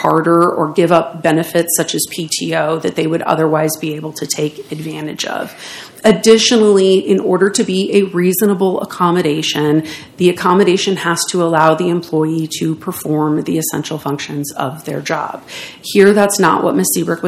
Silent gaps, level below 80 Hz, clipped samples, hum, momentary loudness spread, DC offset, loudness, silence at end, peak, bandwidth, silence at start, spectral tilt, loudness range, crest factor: none; -58 dBFS; 0.2%; none; 12 LU; under 0.1%; -14 LUFS; 0 s; 0 dBFS; 16 kHz; 0 s; -4.5 dB/octave; 6 LU; 14 dB